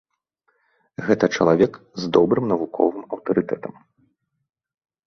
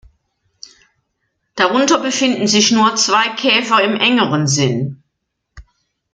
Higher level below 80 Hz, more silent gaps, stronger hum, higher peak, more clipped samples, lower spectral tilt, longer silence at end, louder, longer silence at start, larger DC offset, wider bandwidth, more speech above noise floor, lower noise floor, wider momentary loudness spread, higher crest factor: second, -58 dBFS vs -52 dBFS; neither; neither; about the same, -2 dBFS vs -2 dBFS; neither; first, -6.5 dB/octave vs -3 dB/octave; first, 1.35 s vs 0.5 s; second, -21 LUFS vs -13 LUFS; second, 1 s vs 1.55 s; neither; second, 6.8 kHz vs 9.6 kHz; second, 50 dB vs 59 dB; about the same, -70 dBFS vs -73 dBFS; first, 13 LU vs 6 LU; first, 22 dB vs 16 dB